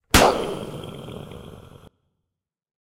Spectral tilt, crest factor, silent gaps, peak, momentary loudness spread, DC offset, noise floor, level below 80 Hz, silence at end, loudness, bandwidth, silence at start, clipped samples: -3.5 dB/octave; 22 dB; none; -2 dBFS; 24 LU; under 0.1%; -83 dBFS; -38 dBFS; 1.25 s; -21 LUFS; 16 kHz; 0.15 s; under 0.1%